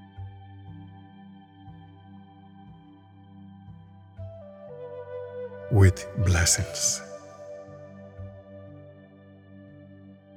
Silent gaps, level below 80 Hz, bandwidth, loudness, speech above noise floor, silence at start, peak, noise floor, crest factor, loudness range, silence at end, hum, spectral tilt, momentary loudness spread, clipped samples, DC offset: none; -48 dBFS; 16 kHz; -25 LUFS; 29 dB; 0 s; -6 dBFS; -51 dBFS; 26 dB; 23 LU; 0.2 s; none; -4 dB/octave; 28 LU; under 0.1%; under 0.1%